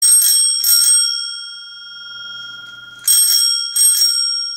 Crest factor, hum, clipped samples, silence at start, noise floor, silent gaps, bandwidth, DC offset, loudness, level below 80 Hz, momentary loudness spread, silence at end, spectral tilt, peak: 14 dB; none; under 0.1%; 0 s; -35 dBFS; none; 16.5 kHz; under 0.1%; -11 LUFS; -76 dBFS; 21 LU; 0 s; 6 dB/octave; 0 dBFS